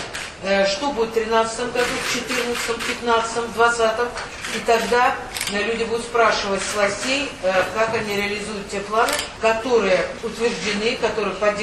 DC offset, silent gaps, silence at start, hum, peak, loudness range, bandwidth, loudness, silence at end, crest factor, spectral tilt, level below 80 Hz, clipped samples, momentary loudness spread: under 0.1%; none; 0 s; none; -2 dBFS; 1 LU; 13.5 kHz; -21 LUFS; 0 s; 18 dB; -3 dB/octave; -46 dBFS; under 0.1%; 6 LU